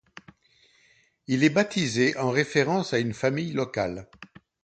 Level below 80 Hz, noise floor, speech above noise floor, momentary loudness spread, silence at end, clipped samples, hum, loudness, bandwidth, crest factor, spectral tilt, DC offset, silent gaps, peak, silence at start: -60 dBFS; -63 dBFS; 38 dB; 8 LU; 0.4 s; under 0.1%; none; -25 LUFS; 9.2 kHz; 20 dB; -5 dB/octave; under 0.1%; none; -6 dBFS; 1.3 s